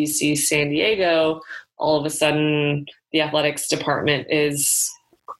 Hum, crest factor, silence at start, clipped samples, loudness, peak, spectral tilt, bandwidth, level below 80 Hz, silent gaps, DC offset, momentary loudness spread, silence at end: none; 18 dB; 0 s; under 0.1%; -20 LUFS; -4 dBFS; -3 dB/octave; 14 kHz; -56 dBFS; none; under 0.1%; 7 LU; 0.05 s